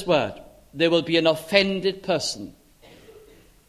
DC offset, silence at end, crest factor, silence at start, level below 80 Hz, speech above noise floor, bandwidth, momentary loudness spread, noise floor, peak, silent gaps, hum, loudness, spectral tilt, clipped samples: under 0.1%; 0.5 s; 22 dB; 0 s; -56 dBFS; 30 dB; 15 kHz; 15 LU; -52 dBFS; -2 dBFS; none; none; -22 LUFS; -4.5 dB/octave; under 0.1%